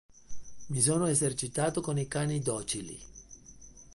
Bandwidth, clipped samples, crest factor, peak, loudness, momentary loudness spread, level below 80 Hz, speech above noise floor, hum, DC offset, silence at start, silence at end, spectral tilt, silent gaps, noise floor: 11.5 kHz; under 0.1%; 20 dB; -12 dBFS; -30 LUFS; 23 LU; -58 dBFS; 21 dB; none; under 0.1%; 0.15 s; 0 s; -4.5 dB/octave; none; -52 dBFS